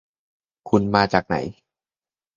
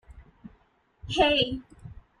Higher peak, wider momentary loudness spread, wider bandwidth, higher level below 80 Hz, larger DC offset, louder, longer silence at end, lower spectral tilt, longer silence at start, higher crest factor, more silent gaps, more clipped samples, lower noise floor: first, 0 dBFS vs -10 dBFS; second, 8 LU vs 26 LU; second, 7.4 kHz vs 10.5 kHz; about the same, -50 dBFS vs -48 dBFS; neither; first, -21 LUFS vs -24 LUFS; first, 0.85 s vs 0.2 s; first, -6.5 dB/octave vs -4.5 dB/octave; first, 0.65 s vs 0.1 s; about the same, 24 dB vs 20 dB; neither; neither; first, under -90 dBFS vs -64 dBFS